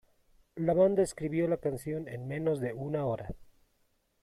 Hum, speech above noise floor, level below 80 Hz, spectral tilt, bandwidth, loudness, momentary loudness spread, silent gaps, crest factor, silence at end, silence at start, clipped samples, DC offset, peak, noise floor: none; 42 dB; -58 dBFS; -7.5 dB/octave; 14 kHz; -31 LUFS; 13 LU; none; 18 dB; 0.8 s; 0.55 s; under 0.1%; under 0.1%; -16 dBFS; -73 dBFS